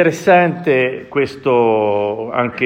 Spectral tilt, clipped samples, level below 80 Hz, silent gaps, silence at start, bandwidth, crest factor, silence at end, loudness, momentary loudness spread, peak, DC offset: -6.5 dB/octave; under 0.1%; -58 dBFS; none; 0 s; 16 kHz; 14 dB; 0 s; -15 LUFS; 7 LU; 0 dBFS; under 0.1%